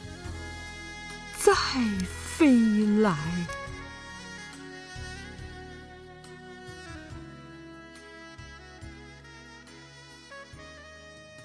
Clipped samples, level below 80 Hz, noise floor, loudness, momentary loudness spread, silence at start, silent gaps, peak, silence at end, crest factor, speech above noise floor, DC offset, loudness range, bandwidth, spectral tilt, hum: under 0.1%; -50 dBFS; -49 dBFS; -27 LUFS; 24 LU; 0 s; none; -6 dBFS; 0 s; 24 dB; 26 dB; under 0.1%; 20 LU; 11 kHz; -5 dB/octave; none